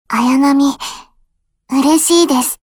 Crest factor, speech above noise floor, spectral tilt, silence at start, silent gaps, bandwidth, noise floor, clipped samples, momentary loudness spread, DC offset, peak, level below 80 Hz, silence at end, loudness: 12 dB; 47 dB; -2 dB/octave; 0.1 s; none; 20 kHz; -59 dBFS; under 0.1%; 11 LU; under 0.1%; -2 dBFS; -52 dBFS; 0.1 s; -12 LUFS